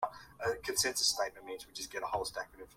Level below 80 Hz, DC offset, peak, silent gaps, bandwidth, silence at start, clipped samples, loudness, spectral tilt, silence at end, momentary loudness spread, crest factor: -64 dBFS; under 0.1%; -16 dBFS; none; 16.5 kHz; 0 s; under 0.1%; -35 LUFS; -0.5 dB/octave; 0.05 s; 14 LU; 22 dB